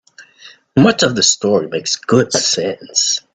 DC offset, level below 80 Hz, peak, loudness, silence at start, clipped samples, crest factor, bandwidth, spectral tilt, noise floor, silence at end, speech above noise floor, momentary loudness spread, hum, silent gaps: under 0.1%; -56 dBFS; 0 dBFS; -14 LUFS; 0.2 s; under 0.1%; 16 dB; 9.6 kHz; -3 dB/octave; -43 dBFS; 0.15 s; 29 dB; 7 LU; none; none